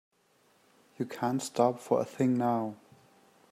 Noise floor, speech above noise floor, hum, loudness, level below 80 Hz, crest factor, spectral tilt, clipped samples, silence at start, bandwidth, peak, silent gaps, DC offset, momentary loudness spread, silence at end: -68 dBFS; 38 dB; none; -31 LUFS; -80 dBFS; 20 dB; -6.5 dB/octave; under 0.1%; 1 s; 14.5 kHz; -12 dBFS; none; under 0.1%; 12 LU; 0.75 s